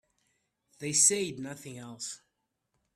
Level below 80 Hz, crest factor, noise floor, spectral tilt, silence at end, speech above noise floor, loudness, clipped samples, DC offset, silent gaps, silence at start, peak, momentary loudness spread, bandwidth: -74 dBFS; 24 dB; -81 dBFS; -2 dB/octave; 0.8 s; 50 dB; -25 LUFS; under 0.1%; under 0.1%; none; 0.8 s; -10 dBFS; 21 LU; 15.5 kHz